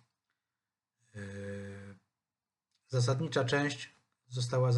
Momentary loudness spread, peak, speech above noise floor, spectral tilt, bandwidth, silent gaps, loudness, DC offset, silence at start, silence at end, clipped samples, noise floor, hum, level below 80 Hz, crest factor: 18 LU; -16 dBFS; over 59 dB; -5.5 dB/octave; 11 kHz; none; -34 LUFS; under 0.1%; 1.15 s; 0 s; under 0.1%; under -90 dBFS; none; -76 dBFS; 20 dB